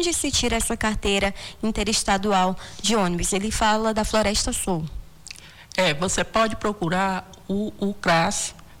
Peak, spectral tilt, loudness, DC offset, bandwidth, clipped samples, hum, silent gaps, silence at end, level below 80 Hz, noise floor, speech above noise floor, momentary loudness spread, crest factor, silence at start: -8 dBFS; -3.5 dB/octave; -23 LUFS; under 0.1%; 19 kHz; under 0.1%; none; none; 0.05 s; -38 dBFS; -43 dBFS; 20 dB; 9 LU; 14 dB; 0 s